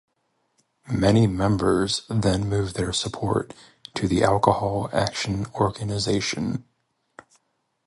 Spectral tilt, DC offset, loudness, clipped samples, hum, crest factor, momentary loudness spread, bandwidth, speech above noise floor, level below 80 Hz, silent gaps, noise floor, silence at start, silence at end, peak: -5.5 dB/octave; under 0.1%; -23 LUFS; under 0.1%; none; 22 dB; 9 LU; 11.5 kHz; 49 dB; -44 dBFS; none; -72 dBFS; 0.85 s; 1.25 s; -2 dBFS